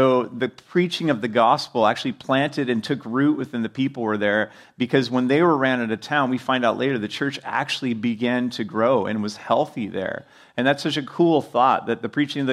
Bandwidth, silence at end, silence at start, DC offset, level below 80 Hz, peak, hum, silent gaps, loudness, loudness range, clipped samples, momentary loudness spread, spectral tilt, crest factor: 13 kHz; 0 s; 0 s; under 0.1%; -70 dBFS; -4 dBFS; none; none; -22 LUFS; 2 LU; under 0.1%; 8 LU; -6 dB/octave; 18 dB